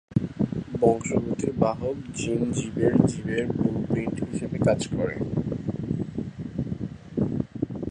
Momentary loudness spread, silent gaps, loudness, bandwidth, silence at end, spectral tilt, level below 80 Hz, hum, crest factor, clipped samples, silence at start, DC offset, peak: 9 LU; none; -27 LUFS; 11 kHz; 0 s; -7 dB/octave; -46 dBFS; none; 22 dB; under 0.1%; 0.1 s; under 0.1%; -4 dBFS